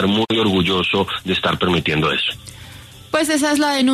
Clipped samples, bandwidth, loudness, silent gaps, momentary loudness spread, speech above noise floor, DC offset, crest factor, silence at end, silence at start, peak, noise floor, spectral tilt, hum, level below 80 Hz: under 0.1%; 13.5 kHz; -17 LUFS; none; 13 LU; 21 dB; under 0.1%; 14 dB; 0 s; 0 s; -4 dBFS; -39 dBFS; -4.5 dB/octave; none; -46 dBFS